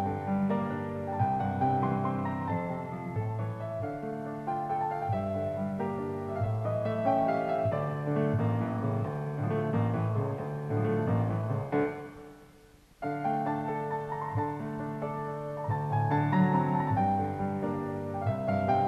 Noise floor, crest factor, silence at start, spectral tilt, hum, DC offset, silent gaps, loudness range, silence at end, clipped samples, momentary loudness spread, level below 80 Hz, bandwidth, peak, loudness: -57 dBFS; 16 dB; 0 s; -9.5 dB/octave; none; under 0.1%; none; 4 LU; 0 s; under 0.1%; 8 LU; -60 dBFS; 7.4 kHz; -14 dBFS; -31 LUFS